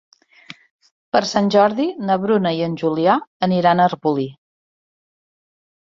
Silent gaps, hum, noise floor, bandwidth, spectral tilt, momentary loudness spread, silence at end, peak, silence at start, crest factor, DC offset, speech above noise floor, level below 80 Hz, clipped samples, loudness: 3.27-3.40 s; none; -43 dBFS; 7.6 kHz; -6 dB/octave; 6 LU; 1.65 s; -2 dBFS; 1.15 s; 18 dB; under 0.1%; 26 dB; -62 dBFS; under 0.1%; -18 LUFS